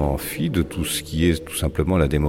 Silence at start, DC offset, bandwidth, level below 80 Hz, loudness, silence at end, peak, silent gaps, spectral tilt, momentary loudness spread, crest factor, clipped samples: 0 s; under 0.1%; 17 kHz; -30 dBFS; -22 LUFS; 0 s; -6 dBFS; none; -5.5 dB/octave; 4 LU; 14 dB; under 0.1%